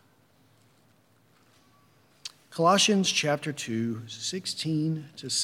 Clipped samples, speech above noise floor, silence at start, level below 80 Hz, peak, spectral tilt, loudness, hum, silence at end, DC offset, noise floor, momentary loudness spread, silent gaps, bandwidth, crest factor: under 0.1%; 36 dB; 2.25 s; -80 dBFS; -10 dBFS; -3.5 dB/octave; -26 LUFS; none; 0 s; under 0.1%; -63 dBFS; 18 LU; none; 16 kHz; 20 dB